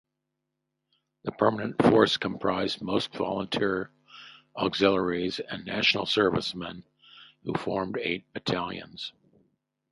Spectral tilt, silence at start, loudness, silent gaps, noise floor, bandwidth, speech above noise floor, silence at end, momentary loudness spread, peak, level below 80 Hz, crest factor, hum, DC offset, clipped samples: -5.5 dB/octave; 1.25 s; -27 LUFS; none; -83 dBFS; 11.5 kHz; 56 dB; 0.8 s; 17 LU; -6 dBFS; -60 dBFS; 24 dB; none; under 0.1%; under 0.1%